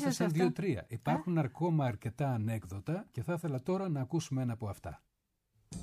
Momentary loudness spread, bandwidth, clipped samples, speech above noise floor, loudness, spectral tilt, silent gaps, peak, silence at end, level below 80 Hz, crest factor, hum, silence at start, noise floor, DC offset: 8 LU; 15 kHz; under 0.1%; 44 dB; -35 LUFS; -7 dB/octave; none; -18 dBFS; 0 s; -64 dBFS; 16 dB; none; 0 s; -78 dBFS; under 0.1%